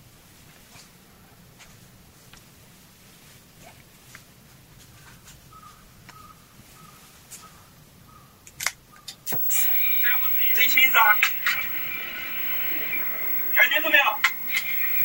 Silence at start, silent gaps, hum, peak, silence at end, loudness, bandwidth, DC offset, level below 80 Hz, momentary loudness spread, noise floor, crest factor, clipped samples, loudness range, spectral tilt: 0.75 s; none; none; -4 dBFS; 0 s; -19 LUFS; 16.5 kHz; under 0.1%; -60 dBFS; 14 LU; -52 dBFS; 22 dB; under 0.1%; 18 LU; -0.5 dB/octave